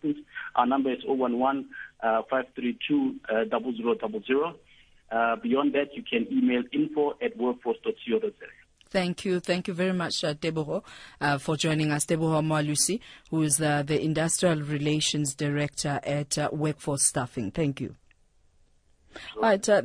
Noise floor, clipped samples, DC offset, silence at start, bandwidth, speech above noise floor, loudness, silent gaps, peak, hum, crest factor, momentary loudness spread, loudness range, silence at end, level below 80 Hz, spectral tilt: -62 dBFS; under 0.1%; under 0.1%; 0 s; 10.5 kHz; 35 dB; -27 LUFS; none; -8 dBFS; none; 18 dB; 8 LU; 4 LU; 0 s; -60 dBFS; -4.5 dB/octave